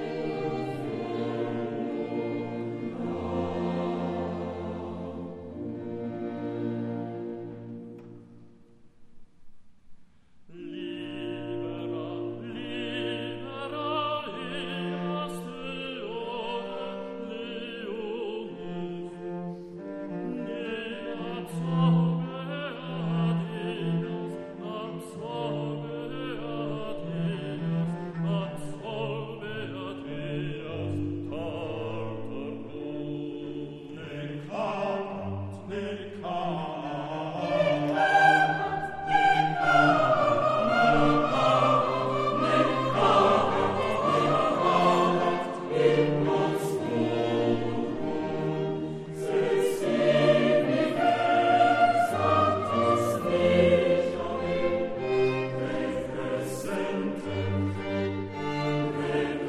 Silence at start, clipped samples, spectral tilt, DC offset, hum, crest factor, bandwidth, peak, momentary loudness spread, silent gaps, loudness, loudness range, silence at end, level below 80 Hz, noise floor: 0 s; under 0.1%; -6.5 dB/octave; under 0.1%; none; 20 dB; 13 kHz; -8 dBFS; 14 LU; none; -28 LUFS; 13 LU; 0 s; -58 dBFS; -53 dBFS